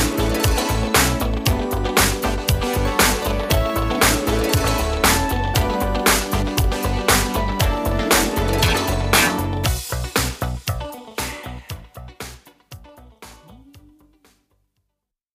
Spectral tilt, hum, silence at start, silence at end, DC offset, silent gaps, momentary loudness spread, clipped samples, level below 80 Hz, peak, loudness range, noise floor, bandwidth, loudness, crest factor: -3.5 dB/octave; none; 0 s; 1.55 s; under 0.1%; none; 11 LU; under 0.1%; -28 dBFS; 0 dBFS; 13 LU; -78 dBFS; 15.5 kHz; -19 LUFS; 20 dB